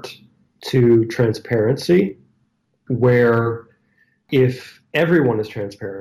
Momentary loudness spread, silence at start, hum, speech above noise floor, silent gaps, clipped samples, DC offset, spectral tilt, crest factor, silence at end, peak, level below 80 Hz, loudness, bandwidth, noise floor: 14 LU; 0.05 s; none; 49 dB; none; under 0.1%; under 0.1%; -7.5 dB/octave; 14 dB; 0 s; -6 dBFS; -54 dBFS; -18 LUFS; 15 kHz; -66 dBFS